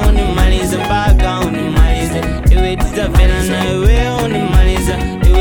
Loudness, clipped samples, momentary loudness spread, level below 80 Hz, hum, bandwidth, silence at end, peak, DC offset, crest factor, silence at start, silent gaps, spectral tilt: -14 LUFS; under 0.1%; 4 LU; -12 dBFS; none; 17 kHz; 0 s; 0 dBFS; 0.1%; 10 dB; 0 s; none; -6 dB/octave